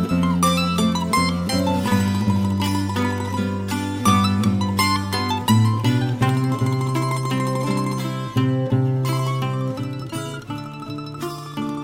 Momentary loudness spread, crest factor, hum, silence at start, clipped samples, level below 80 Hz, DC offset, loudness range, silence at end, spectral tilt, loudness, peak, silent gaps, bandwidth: 11 LU; 18 dB; none; 0 s; under 0.1%; -48 dBFS; under 0.1%; 4 LU; 0 s; -5.5 dB/octave; -21 LUFS; -4 dBFS; none; 16 kHz